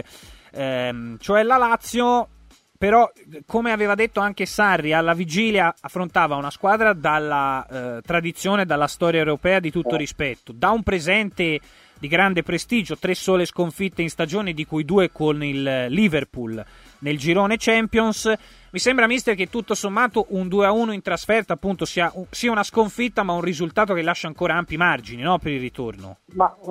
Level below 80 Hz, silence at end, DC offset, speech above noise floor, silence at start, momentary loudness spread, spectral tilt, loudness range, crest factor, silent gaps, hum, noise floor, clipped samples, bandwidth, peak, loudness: -48 dBFS; 0 s; under 0.1%; 25 dB; 0.15 s; 9 LU; -5 dB/octave; 2 LU; 18 dB; none; none; -46 dBFS; under 0.1%; 16 kHz; -2 dBFS; -21 LUFS